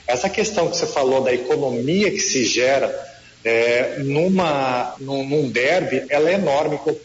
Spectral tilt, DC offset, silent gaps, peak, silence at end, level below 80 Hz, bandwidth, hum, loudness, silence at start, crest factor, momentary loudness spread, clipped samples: -4 dB/octave; under 0.1%; none; -8 dBFS; 0 s; -56 dBFS; 8 kHz; none; -19 LUFS; 0.05 s; 12 dB; 5 LU; under 0.1%